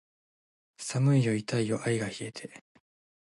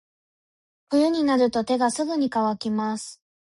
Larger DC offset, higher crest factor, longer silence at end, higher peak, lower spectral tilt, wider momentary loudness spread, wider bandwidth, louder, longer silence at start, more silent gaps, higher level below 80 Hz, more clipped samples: neither; about the same, 18 dB vs 16 dB; first, 0.7 s vs 0.35 s; second, -14 dBFS vs -10 dBFS; first, -6 dB/octave vs -4.5 dB/octave; first, 16 LU vs 8 LU; about the same, 11.5 kHz vs 11.5 kHz; second, -29 LUFS vs -23 LUFS; about the same, 0.8 s vs 0.9 s; neither; second, -70 dBFS vs -64 dBFS; neither